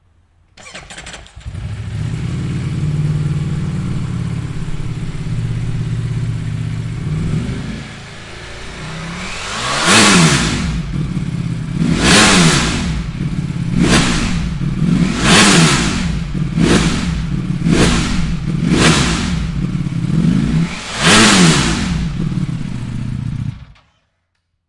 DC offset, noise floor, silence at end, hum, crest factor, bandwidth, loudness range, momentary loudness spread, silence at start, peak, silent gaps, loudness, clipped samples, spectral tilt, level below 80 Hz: under 0.1%; -68 dBFS; 1.05 s; none; 16 dB; 11.5 kHz; 9 LU; 18 LU; 0.55 s; 0 dBFS; none; -15 LUFS; under 0.1%; -4 dB/octave; -28 dBFS